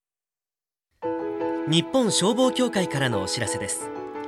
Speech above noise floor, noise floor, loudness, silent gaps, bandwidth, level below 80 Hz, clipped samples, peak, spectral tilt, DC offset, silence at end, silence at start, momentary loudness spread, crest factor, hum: over 67 dB; under -90 dBFS; -24 LUFS; none; 14.5 kHz; -64 dBFS; under 0.1%; -8 dBFS; -4 dB/octave; under 0.1%; 0 s; 1 s; 9 LU; 18 dB; none